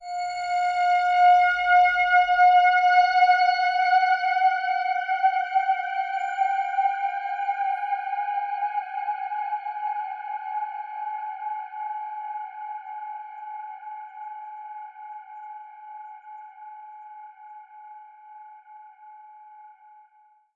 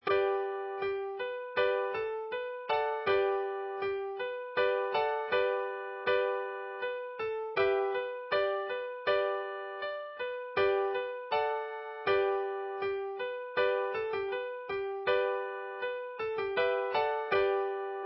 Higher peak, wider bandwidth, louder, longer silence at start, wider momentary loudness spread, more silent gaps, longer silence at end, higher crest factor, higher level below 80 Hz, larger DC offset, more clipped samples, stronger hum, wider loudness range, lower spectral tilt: first, -8 dBFS vs -16 dBFS; first, 7.4 kHz vs 5.6 kHz; first, -23 LUFS vs -33 LUFS; about the same, 0 s vs 0.05 s; first, 23 LU vs 8 LU; neither; first, 0.85 s vs 0 s; about the same, 16 dB vs 16 dB; about the same, -66 dBFS vs -68 dBFS; neither; neither; neither; first, 24 LU vs 1 LU; second, 1.5 dB/octave vs -1 dB/octave